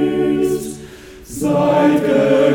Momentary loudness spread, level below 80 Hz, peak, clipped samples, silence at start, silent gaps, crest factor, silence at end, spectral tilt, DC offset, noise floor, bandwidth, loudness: 18 LU; -46 dBFS; -2 dBFS; under 0.1%; 0 s; none; 14 dB; 0 s; -6 dB/octave; under 0.1%; -36 dBFS; 19 kHz; -15 LUFS